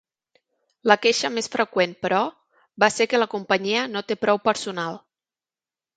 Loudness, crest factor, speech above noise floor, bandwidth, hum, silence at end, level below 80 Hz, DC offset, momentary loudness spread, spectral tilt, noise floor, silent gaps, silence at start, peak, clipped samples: -22 LUFS; 22 dB; over 68 dB; 9.4 kHz; none; 1 s; -70 dBFS; under 0.1%; 10 LU; -3 dB/octave; under -90 dBFS; none; 0.85 s; -2 dBFS; under 0.1%